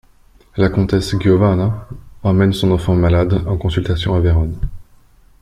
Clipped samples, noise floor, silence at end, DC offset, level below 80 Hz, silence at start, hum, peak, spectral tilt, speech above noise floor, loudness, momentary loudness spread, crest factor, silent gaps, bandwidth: under 0.1%; -48 dBFS; 0.6 s; under 0.1%; -30 dBFS; 0.55 s; none; -2 dBFS; -7.5 dB/octave; 34 dB; -16 LUFS; 12 LU; 14 dB; none; 12 kHz